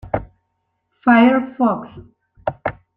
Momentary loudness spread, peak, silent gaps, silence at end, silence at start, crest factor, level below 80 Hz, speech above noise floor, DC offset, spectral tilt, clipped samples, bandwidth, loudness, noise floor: 16 LU; -2 dBFS; none; 0.25 s; 0.05 s; 18 dB; -48 dBFS; 56 dB; under 0.1%; -9 dB/octave; under 0.1%; 4.1 kHz; -18 LUFS; -72 dBFS